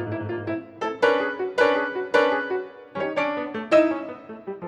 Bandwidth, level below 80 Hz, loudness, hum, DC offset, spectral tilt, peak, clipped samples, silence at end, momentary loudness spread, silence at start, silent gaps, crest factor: 10.5 kHz; -68 dBFS; -24 LUFS; none; under 0.1%; -5.5 dB/octave; -4 dBFS; under 0.1%; 0 s; 12 LU; 0 s; none; 20 dB